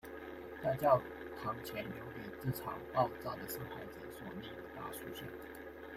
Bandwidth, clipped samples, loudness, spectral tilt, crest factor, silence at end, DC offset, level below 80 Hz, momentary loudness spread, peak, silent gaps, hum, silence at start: 16 kHz; under 0.1%; -40 LUFS; -6 dB/octave; 24 dB; 0 s; under 0.1%; -64 dBFS; 15 LU; -16 dBFS; none; none; 0.05 s